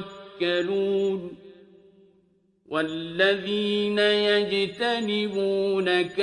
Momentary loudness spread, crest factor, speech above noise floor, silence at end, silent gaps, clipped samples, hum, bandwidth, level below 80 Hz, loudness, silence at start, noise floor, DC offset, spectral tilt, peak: 8 LU; 18 dB; 40 dB; 0 s; none; under 0.1%; none; 10.5 kHz; -68 dBFS; -24 LUFS; 0 s; -64 dBFS; under 0.1%; -5 dB/octave; -8 dBFS